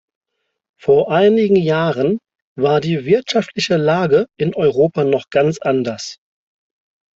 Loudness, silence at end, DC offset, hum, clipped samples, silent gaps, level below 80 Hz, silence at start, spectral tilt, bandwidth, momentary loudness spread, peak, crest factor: -16 LUFS; 1.05 s; under 0.1%; none; under 0.1%; 2.42-2.56 s; -56 dBFS; 0.85 s; -6 dB/octave; 7.8 kHz; 7 LU; -2 dBFS; 14 dB